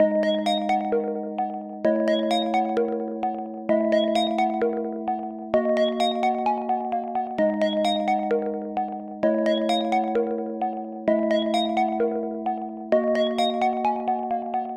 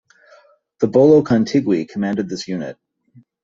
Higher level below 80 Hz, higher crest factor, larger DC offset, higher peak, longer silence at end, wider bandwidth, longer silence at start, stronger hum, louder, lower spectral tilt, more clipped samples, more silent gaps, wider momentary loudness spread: second, -64 dBFS vs -58 dBFS; about the same, 16 dB vs 18 dB; neither; second, -8 dBFS vs 0 dBFS; second, 0 s vs 0.7 s; first, 11.5 kHz vs 7.8 kHz; second, 0 s vs 0.8 s; neither; second, -24 LUFS vs -17 LUFS; second, -5.5 dB/octave vs -7 dB/octave; neither; neither; second, 7 LU vs 14 LU